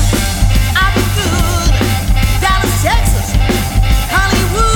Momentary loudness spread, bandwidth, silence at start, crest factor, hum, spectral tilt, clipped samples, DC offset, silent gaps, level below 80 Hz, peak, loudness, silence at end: 2 LU; 19.5 kHz; 0 s; 10 dB; none; -4 dB/octave; under 0.1%; under 0.1%; none; -14 dBFS; 0 dBFS; -13 LUFS; 0 s